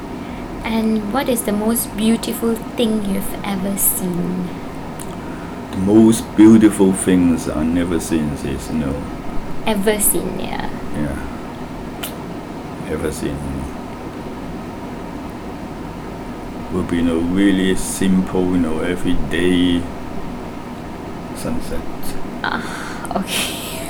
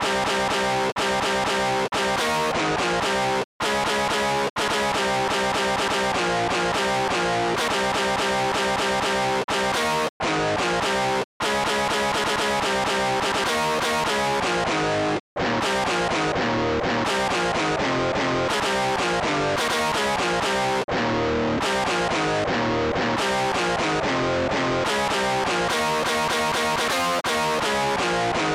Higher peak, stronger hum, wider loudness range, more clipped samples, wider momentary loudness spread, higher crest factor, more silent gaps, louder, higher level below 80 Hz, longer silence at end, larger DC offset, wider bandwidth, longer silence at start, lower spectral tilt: first, -2 dBFS vs -16 dBFS; neither; first, 12 LU vs 1 LU; neither; first, 15 LU vs 1 LU; first, 18 dB vs 6 dB; second, none vs 0.92-0.96 s, 3.44-3.60 s, 4.50-4.56 s, 9.44-9.48 s, 10.09-10.20 s, 11.24-11.40 s, 15.20-15.36 s, 20.84-20.88 s; first, -19 LUFS vs -22 LUFS; first, -34 dBFS vs -46 dBFS; about the same, 0 s vs 0 s; neither; first, over 20 kHz vs 16 kHz; about the same, 0 s vs 0 s; first, -5 dB/octave vs -3.5 dB/octave